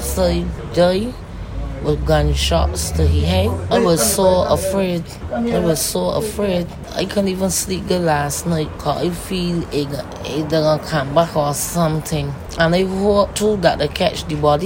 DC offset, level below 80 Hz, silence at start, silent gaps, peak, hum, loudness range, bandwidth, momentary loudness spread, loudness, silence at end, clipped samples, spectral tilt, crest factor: under 0.1%; -28 dBFS; 0 s; none; 0 dBFS; none; 3 LU; 16.5 kHz; 8 LU; -18 LUFS; 0 s; under 0.1%; -5 dB/octave; 18 dB